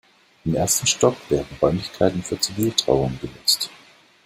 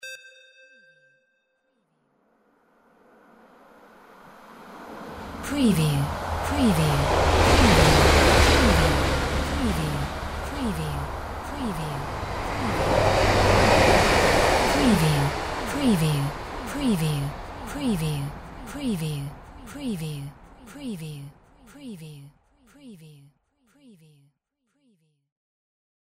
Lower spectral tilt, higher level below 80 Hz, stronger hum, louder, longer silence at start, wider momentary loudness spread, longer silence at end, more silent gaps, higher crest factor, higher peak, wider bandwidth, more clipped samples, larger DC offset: second, -3.5 dB/octave vs -5 dB/octave; second, -46 dBFS vs -34 dBFS; neither; about the same, -21 LUFS vs -22 LUFS; first, 0.45 s vs 0.05 s; second, 7 LU vs 22 LU; second, 0.55 s vs 3.05 s; neither; about the same, 22 dB vs 20 dB; about the same, -2 dBFS vs -4 dBFS; about the same, 16 kHz vs 16 kHz; neither; neither